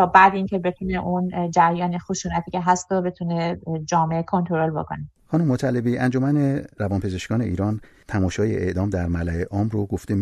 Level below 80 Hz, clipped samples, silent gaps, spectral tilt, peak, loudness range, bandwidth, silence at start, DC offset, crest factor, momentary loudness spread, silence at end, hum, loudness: -44 dBFS; under 0.1%; none; -6.5 dB/octave; -2 dBFS; 2 LU; 10.5 kHz; 0 s; under 0.1%; 20 dB; 8 LU; 0 s; none; -23 LUFS